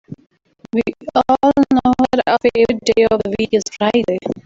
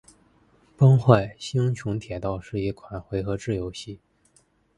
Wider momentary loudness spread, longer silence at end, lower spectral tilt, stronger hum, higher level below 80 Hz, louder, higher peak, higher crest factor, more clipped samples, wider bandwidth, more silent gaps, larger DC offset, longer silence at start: second, 7 LU vs 18 LU; second, 0.05 s vs 0.8 s; second, -5 dB/octave vs -7.5 dB/octave; neither; about the same, -46 dBFS vs -48 dBFS; first, -16 LUFS vs -24 LUFS; about the same, -2 dBFS vs 0 dBFS; second, 14 dB vs 24 dB; neither; second, 7.8 kHz vs 10.5 kHz; neither; neither; second, 0.1 s vs 0.8 s